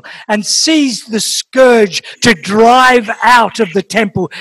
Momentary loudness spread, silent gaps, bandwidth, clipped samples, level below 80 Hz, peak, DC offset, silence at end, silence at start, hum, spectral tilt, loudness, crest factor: 8 LU; none; 16 kHz; 2%; -46 dBFS; 0 dBFS; under 0.1%; 0 s; 0.05 s; none; -3 dB/octave; -10 LUFS; 10 dB